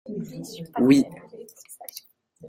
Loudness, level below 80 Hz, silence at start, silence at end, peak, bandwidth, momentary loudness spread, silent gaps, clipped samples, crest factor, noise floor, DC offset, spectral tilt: -22 LUFS; -66 dBFS; 0.05 s; 0 s; -6 dBFS; 16.5 kHz; 25 LU; none; under 0.1%; 20 dB; -50 dBFS; under 0.1%; -6 dB/octave